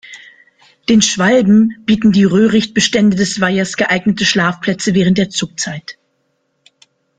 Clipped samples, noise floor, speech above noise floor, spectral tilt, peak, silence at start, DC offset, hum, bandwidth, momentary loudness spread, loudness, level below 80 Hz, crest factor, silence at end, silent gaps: under 0.1%; -65 dBFS; 52 dB; -4.5 dB/octave; 0 dBFS; 0.1 s; under 0.1%; none; 9.4 kHz; 9 LU; -13 LUFS; -48 dBFS; 14 dB; 1.25 s; none